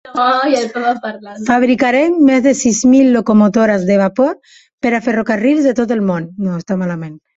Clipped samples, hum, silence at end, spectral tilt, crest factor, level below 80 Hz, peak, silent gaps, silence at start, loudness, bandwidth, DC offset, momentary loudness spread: under 0.1%; none; 0.2 s; -5.5 dB/octave; 12 dB; -52 dBFS; -2 dBFS; 4.73-4.78 s; 0.05 s; -13 LUFS; 8.2 kHz; under 0.1%; 10 LU